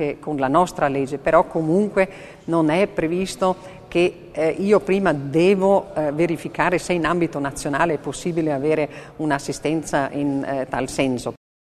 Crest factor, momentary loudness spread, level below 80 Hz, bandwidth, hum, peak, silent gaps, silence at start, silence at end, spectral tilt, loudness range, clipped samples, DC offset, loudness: 20 dB; 7 LU; -48 dBFS; 13.5 kHz; none; -2 dBFS; none; 0 s; 0.35 s; -6 dB/octave; 3 LU; under 0.1%; under 0.1%; -21 LUFS